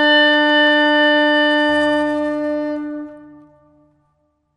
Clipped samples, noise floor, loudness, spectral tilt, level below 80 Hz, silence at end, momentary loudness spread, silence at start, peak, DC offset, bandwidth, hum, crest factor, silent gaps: under 0.1%; -65 dBFS; -14 LUFS; -3.5 dB/octave; -56 dBFS; 1.3 s; 14 LU; 0 s; -4 dBFS; under 0.1%; 10.5 kHz; none; 12 dB; none